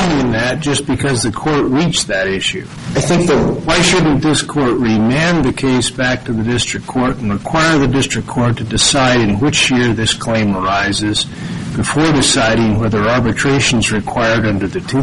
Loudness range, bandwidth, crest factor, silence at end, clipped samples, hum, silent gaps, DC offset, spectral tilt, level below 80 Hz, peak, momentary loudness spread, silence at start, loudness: 2 LU; 11.5 kHz; 14 dB; 0 s; under 0.1%; none; none; 0.4%; -4.5 dB/octave; -34 dBFS; 0 dBFS; 6 LU; 0 s; -14 LUFS